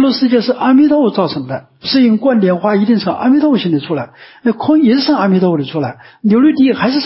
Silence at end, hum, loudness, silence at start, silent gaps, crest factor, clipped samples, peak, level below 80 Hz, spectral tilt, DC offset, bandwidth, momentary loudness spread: 0 s; none; -12 LUFS; 0 s; none; 10 dB; under 0.1%; -2 dBFS; -56 dBFS; -10 dB/octave; under 0.1%; 5.8 kHz; 11 LU